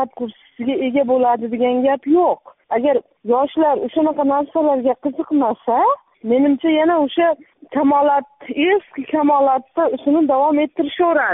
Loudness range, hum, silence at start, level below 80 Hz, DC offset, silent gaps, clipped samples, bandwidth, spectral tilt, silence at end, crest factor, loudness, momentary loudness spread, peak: 1 LU; none; 0 s; -62 dBFS; under 0.1%; none; under 0.1%; 3.9 kHz; -3 dB/octave; 0 s; 12 dB; -17 LUFS; 8 LU; -6 dBFS